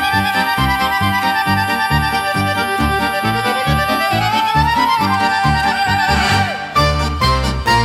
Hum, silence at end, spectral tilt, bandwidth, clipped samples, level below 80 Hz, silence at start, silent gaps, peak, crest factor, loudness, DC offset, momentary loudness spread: none; 0 s; -4.5 dB/octave; 16.5 kHz; under 0.1%; -28 dBFS; 0 s; none; -2 dBFS; 12 dB; -15 LUFS; under 0.1%; 3 LU